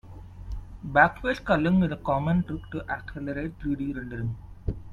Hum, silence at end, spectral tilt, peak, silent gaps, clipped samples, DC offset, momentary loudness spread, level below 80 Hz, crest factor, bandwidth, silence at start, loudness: none; 0 s; -8.5 dB/octave; -4 dBFS; none; under 0.1%; under 0.1%; 19 LU; -42 dBFS; 24 dB; 7.2 kHz; 0.05 s; -27 LUFS